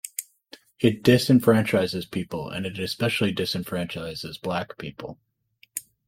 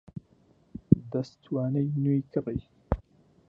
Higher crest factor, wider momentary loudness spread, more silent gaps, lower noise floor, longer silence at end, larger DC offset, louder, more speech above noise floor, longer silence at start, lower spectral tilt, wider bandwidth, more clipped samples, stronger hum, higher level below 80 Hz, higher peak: second, 20 dB vs 26 dB; second, 17 LU vs 21 LU; neither; second, -52 dBFS vs -63 dBFS; second, 0.25 s vs 0.5 s; neither; first, -24 LUFS vs -29 LUFS; second, 28 dB vs 34 dB; about the same, 0.05 s vs 0.15 s; second, -5.5 dB/octave vs -10.5 dB/octave; first, 16.5 kHz vs 6.8 kHz; neither; neither; second, -58 dBFS vs -46 dBFS; about the same, -4 dBFS vs -4 dBFS